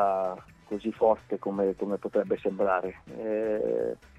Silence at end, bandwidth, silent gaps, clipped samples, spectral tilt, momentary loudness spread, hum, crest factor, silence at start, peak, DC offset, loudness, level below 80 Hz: 0.25 s; 9 kHz; none; under 0.1%; -8 dB/octave; 10 LU; none; 18 dB; 0 s; -10 dBFS; under 0.1%; -29 LUFS; -62 dBFS